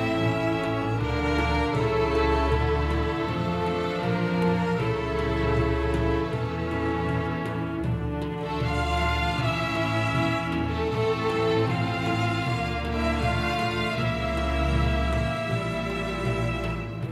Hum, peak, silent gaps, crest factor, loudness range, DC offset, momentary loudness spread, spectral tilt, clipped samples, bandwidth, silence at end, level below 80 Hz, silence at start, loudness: none; -12 dBFS; none; 14 dB; 2 LU; under 0.1%; 5 LU; -6.5 dB/octave; under 0.1%; 13.5 kHz; 0 s; -34 dBFS; 0 s; -26 LUFS